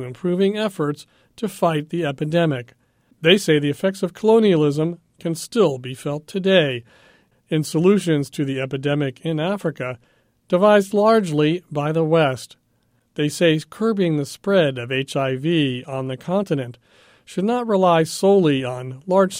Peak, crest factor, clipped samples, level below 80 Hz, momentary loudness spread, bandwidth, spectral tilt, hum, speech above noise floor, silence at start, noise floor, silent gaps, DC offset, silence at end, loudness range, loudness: 0 dBFS; 20 dB; under 0.1%; -62 dBFS; 12 LU; 16.5 kHz; -6 dB/octave; none; 45 dB; 0 s; -64 dBFS; none; under 0.1%; 0 s; 3 LU; -20 LUFS